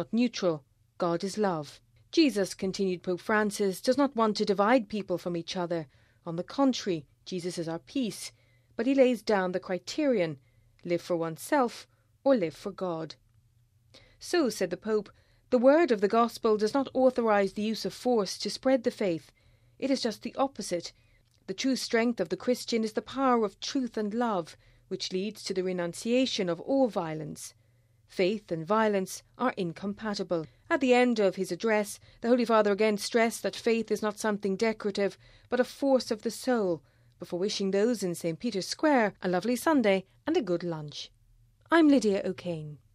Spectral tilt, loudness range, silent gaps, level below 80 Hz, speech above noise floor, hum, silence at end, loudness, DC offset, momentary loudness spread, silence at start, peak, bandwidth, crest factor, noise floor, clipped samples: -5 dB/octave; 5 LU; none; -68 dBFS; 37 dB; none; 0.2 s; -29 LUFS; under 0.1%; 12 LU; 0 s; -10 dBFS; 15 kHz; 18 dB; -65 dBFS; under 0.1%